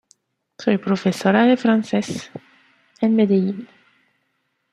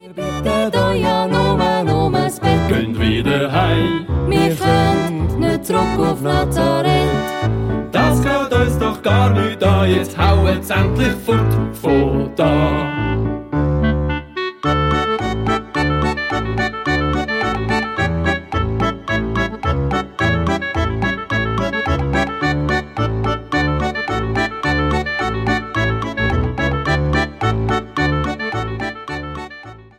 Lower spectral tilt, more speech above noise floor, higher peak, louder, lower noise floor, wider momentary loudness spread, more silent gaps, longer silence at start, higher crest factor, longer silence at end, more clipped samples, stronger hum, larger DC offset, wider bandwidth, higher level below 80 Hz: about the same, -6.5 dB/octave vs -6.5 dB/octave; first, 53 dB vs 22 dB; about the same, -2 dBFS vs -4 dBFS; about the same, -19 LUFS vs -17 LUFS; first, -71 dBFS vs -37 dBFS; first, 16 LU vs 6 LU; neither; first, 0.6 s vs 0.05 s; about the same, 18 dB vs 14 dB; first, 1.1 s vs 0.15 s; neither; neither; neither; second, 12.5 kHz vs 16.5 kHz; second, -66 dBFS vs -28 dBFS